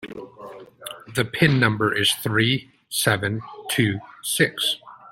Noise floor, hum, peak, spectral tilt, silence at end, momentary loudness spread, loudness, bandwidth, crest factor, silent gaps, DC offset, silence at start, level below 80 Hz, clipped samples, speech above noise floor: -41 dBFS; none; -2 dBFS; -4 dB/octave; 0.05 s; 19 LU; -22 LUFS; 16.5 kHz; 22 dB; none; under 0.1%; 0 s; -58 dBFS; under 0.1%; 20 dB